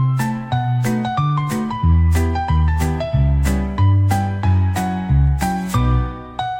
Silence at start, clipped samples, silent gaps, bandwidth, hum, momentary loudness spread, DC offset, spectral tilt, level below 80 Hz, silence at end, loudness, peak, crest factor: 0 s; under 0.1%; none; 17 kHz; none; 5 LU; under 0.1%; -7 dB/octave; -24 dBFS; 0 s; -18 LUFS; -4 dBFS; 12 dB